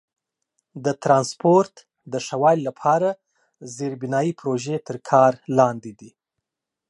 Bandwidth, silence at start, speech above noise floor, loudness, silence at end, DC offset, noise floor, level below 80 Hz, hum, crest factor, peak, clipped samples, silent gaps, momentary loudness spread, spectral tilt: 11.5 kHz; 0.75 s; 64 dB; -21 LUFS; 0.8 s; under 0.1%; -85 dBFS; -70 dBFS; none; 20 dB; -2 dBFS; under 0.1%; none; 13 LU; -6 dB/octave